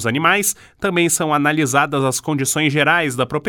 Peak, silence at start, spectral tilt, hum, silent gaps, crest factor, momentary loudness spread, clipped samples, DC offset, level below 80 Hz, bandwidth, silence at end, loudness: 0 dBFS; 0 s; -3.5 dB/octave; none; none; 18 dB; 5 LU; under 0.1%; under 0.1%; -54 dBFS; 19 kHz; 0 s; -17 LUFS